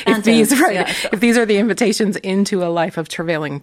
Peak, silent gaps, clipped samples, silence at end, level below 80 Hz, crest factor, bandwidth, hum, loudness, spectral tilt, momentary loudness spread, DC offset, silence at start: 0 dBFS; none; under 0.1%; 0.05 s; -54 dBFS; 16 dB; 16 kHz; none; -16 LUFS; -4.5 dB/octave; 8 LU; under 0.1%; 0 s